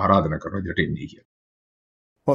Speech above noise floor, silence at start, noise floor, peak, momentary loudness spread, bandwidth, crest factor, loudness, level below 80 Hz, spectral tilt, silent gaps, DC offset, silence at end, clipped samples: over 67 dB; 0 s; under -90 dBFS; -2 dBFS; 13 LU; 7.2 kHz; 22 dB; -24 LUFS; -50 dBFS; -8 dB/octave; 1.25-2.16 s; under 0.1%; 0 s; under 0.1%